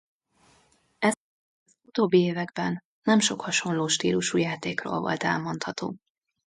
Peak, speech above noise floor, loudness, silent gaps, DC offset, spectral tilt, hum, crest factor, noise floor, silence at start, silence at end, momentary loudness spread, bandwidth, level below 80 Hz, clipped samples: -10 dBFS; 38 dB; -26 LUFS; 1.17-1.66 s, 2.85-3.02 s; under 0.1%; -4 dB/octave; none; 18 dB; -64 dBFS; 1 s; 0.5 s; 10 LU; 11.5 kHz; -68 dBFS; under 0.1%